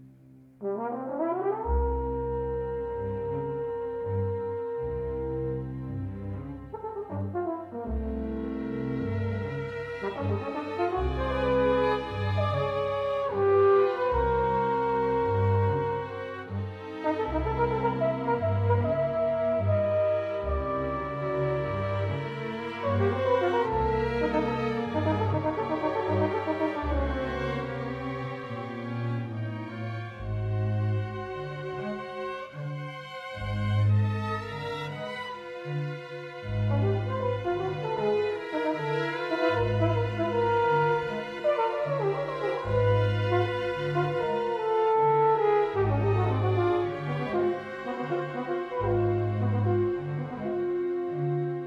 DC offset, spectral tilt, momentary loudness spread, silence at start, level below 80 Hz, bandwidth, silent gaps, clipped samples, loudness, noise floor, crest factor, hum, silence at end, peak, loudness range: under 0.1%; -8.5 dB/octave; 10 LU; 0 s; -44 dBFS; 7.2 kHz; none; under 0.1%; -29 LUFS; -53 dBFS; 16 dB; none; 0 s; -12 dBFS; 7 LU